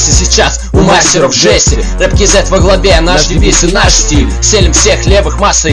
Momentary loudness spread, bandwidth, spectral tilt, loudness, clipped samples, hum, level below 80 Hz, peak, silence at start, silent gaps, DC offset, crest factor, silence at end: 4 LU; 11 kHz; -3 dB/octave; -7 LUFS; 2%; none; -12 dBFS; 0 dBFS; 0 s; none; under 0.1%; 6 dB; 0 s